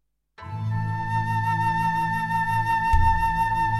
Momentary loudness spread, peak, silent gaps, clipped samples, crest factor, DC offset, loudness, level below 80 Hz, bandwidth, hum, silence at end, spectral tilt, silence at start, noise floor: 8 LU; -8 dBFS; none; under 0.1%; 16 dB; under 0.1%; -24 LUFS; -32 dBFS; 13 kHz; none; 0 s; -6 dB/octave; 0.4 s; -44 dBFS